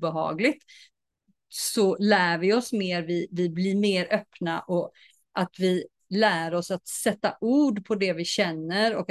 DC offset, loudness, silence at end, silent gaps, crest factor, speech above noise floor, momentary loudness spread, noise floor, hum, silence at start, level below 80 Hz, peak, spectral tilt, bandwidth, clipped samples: under 0.1%; -26 LUFS; 0.05 s; none; 18 dB; 47 dB; 9 LU; -72 dBFS; none; 0 s; -72 dBFS; -8 dBFS; -4.5 dB/octave; 12.5 kHz; under 0.1%